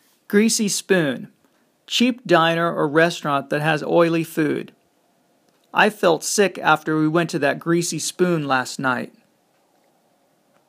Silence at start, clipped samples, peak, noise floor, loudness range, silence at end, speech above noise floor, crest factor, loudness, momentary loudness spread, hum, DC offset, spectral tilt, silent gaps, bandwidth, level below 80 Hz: 0.3 s; under 0.1%; -2 dBFS; -62 dBFS; 3 LU; 1.6 s; 43 dB; 20 dB; -20 LUFS; 7 LU; none; under 0.1%; -4 dB/octave; none; 15.5 kHz; -74 dBFS